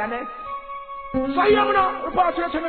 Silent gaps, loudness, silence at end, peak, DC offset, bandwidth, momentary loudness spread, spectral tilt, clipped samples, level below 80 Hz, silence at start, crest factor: none; -21 LUFS; 0 s; -6 dBFS; 0.3%; 4.5 kHz; 15 LU; -8.5 dB/octave; under 0.1%; -46 dBFS; 0 s; 16 dB